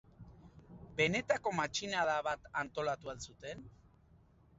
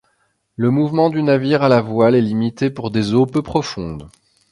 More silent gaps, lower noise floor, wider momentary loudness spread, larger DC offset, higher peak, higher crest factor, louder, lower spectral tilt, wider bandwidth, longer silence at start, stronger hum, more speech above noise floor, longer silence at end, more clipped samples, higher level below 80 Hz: neither; about the same, -65 dBFS vs -65 dBFS; first, 22 LU vs 12 LU; neither; second, -18 dBFS vs 0 dBFS; first, 22 dB vs 16 dB; second, -36 LUFS vs -17 LUFS; second, -2.5 dB/octave vs -7.5 dB/octave; second, 7.6 kHz vs 11 kHz; second, 0.2 s vs 0.6 s; neither; second, 28 dB vs 48 dB; first, 0.9 s vs 0.45 s; neither; second, -64 dBFS vs -48 dBFS